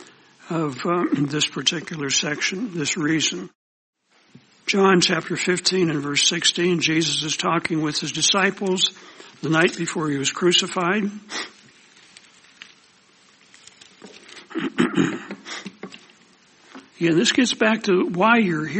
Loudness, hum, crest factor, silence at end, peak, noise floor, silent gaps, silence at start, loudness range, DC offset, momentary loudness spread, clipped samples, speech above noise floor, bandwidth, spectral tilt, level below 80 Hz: -20 LUFS; none; 20 dB; 0 s; -4 dBFS; -55 dBFS; 3.55-3.93 s; 0 s; 9 LU; under 0.1%; 15 LU; under 0.1%; 34 dB; 8.8 kHz; -3 dB/octave; -66 dBFS